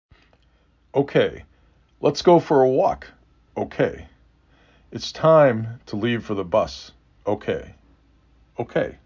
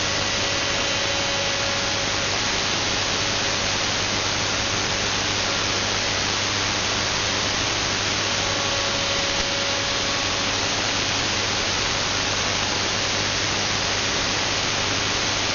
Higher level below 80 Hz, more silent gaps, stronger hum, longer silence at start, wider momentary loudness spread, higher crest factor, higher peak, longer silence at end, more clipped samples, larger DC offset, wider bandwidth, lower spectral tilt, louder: second, -52 dBFS vs -42 dBFS; neither; neither; first, 0.95 s vs 0 s; first, 18 LU vs 0 LU; about the same, 20 dB vs 18 dB; about the same, -4 dBFS vs -6 dBFS; about the same, 0.1 s vs 0 s; neither; neither; about the same, 7.6 kHz vs 7.4 kHz; first, -6.5 dB/octave vs -1 dB/octave; about the same, -21 LUFS vs -21 LUFS